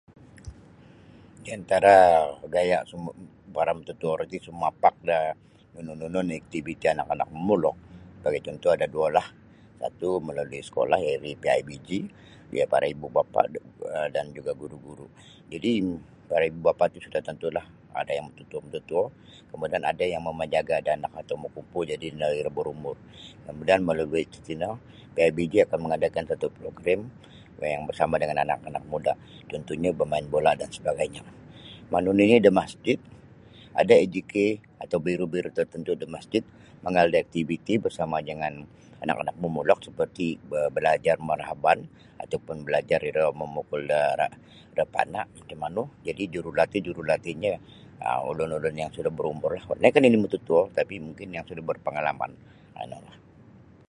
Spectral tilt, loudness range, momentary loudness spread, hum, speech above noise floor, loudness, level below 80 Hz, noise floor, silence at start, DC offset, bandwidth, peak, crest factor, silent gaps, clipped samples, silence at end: -6 dB/octave; 6 LU; 15 LU; none; 26 dB; -26 LUFS; -56 dBFS; -52 dBFS; 0.45 s; under 0.1%; 11.5 kHz; -2 dBFS; 24 dB; none; under 0.1%; 0.85 s